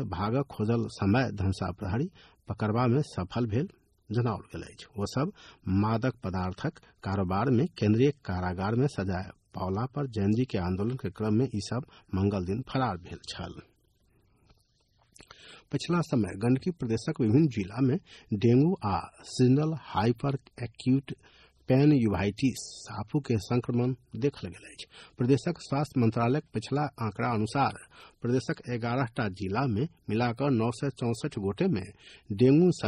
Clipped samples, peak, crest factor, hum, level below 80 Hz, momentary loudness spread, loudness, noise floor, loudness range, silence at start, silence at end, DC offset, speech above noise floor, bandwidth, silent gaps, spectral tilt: under 0.1%; -12 dBFS; 18 dB; none; -56 dBFS; 14 LU; -29 LUFS; -68 dBFS; 5 LU; 0 s; 0 s; under 0.1%; 40 dB; 12 kHz; none; -7.5 dB/octave